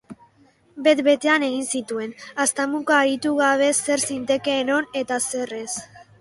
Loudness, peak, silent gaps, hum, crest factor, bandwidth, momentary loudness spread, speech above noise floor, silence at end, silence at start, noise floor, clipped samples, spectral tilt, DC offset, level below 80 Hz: -21 LUFS; -4 dBFS; none; none; 18 dB; 12 kHz; 11 LU; 36 dB; 0.2 s; 0.1 s; -57 dBFS; under 0.1%; -2 dB/octave; under 0.1%; -66 dBFS